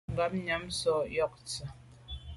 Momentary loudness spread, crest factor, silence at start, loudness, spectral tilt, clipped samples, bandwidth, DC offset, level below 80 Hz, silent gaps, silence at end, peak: 16 LU; 16 dB; 0.1 s; -33 LUFS; -4 dB/octave; under 0.1%; 11.5 kHz; under 0.1%; -52 dBFS; none; 0 s; -18 dBFS